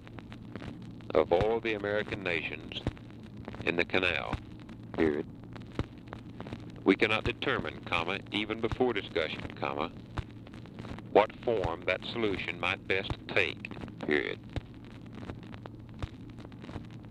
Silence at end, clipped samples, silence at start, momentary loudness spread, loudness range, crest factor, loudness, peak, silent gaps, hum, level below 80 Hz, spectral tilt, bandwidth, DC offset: 0 s; under 0.1%; 0 s; 18 LU; 3 LU; 24 dB; -32 LUFS; -10 dBFS; none; none; -52 dBFS; -6.5 dB/octave; 11 kHz; under 0.1%